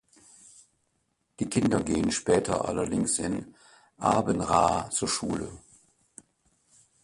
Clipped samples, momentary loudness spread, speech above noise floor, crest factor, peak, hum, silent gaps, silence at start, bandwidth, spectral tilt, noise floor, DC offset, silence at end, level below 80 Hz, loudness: under 0.1%; 9 LU; 48 dB; 22 dB; -8 dBFS; none; none; 1.4 s; 11.5 kHz; -4.5 dB/octave; -75 dBFS; under 0.1%; 1.45 s; -52 dBFS; -27 LUFS